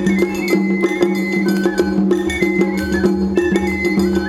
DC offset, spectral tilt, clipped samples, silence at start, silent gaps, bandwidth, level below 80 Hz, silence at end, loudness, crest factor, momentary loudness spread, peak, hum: under 0.1%; -6.5 dB/octave; under 0.1%; 0 s; none; 14.5 kHz; -36 dBFS; 0 s; -17 LUFS; 14 dB; 1 LU; -2 dBFS; none